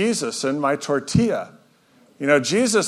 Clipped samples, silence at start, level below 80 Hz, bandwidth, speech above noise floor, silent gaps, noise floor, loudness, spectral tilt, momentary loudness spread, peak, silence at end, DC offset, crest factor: under 0.1%; 0 s; -52 dBFS; 14.5 kHz; 36 dB; none; -56 dBFS; -21 LUFS; -4.5 dB/octave; 9 LU; -2 dBFS; 0 s; under 0.1%; 18 dB